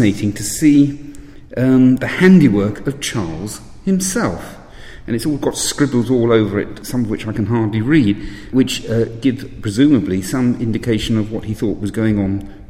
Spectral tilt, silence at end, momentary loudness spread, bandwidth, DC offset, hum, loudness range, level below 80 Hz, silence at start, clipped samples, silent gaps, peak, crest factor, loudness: -6 dB/octave; 0 s; 12 LU; 16 kHz; under 0.1%; none; 4 LU; -38 dBFS; 0 s; under 0.1%; none; 0 dBFS; 16 dB; -16 LUFS